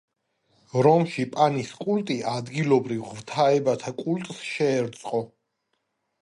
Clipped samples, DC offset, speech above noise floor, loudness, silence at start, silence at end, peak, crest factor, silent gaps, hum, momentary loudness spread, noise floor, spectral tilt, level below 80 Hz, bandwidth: under 0.1%; under 0.1%; 52 dB; -25 LUFS; 0.75 s; 0.95 s; -6 dBFS; 18 dB; none; none; 11 LU; -76 dBFS; -6 dB/octave; -70 dBFS; 11.5 kHz